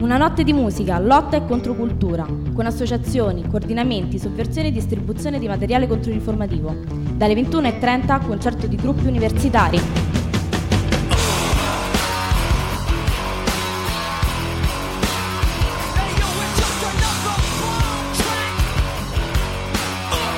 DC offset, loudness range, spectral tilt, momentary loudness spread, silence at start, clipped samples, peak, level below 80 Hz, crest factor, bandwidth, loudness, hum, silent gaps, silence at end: under 0.1%; 3 LU; -5 dB/octave; 6 LU; 0 s; under 0.1%; -2 dBFS; -26 dBFS; 18 dB; 16.5 kHz; -20 LUFS; none; none; 0 s